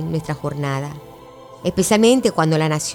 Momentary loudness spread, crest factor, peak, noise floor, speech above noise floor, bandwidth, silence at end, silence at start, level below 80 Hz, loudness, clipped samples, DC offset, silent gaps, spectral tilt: 13 LU; 18 dB; -2 dBFS; -41 dBFS; 22 dB; 19 kHz; 0 s; 0 s; -50 dBFS; -18 LUFS; under 0.1%; under 0.1%; none; -5 dB/octave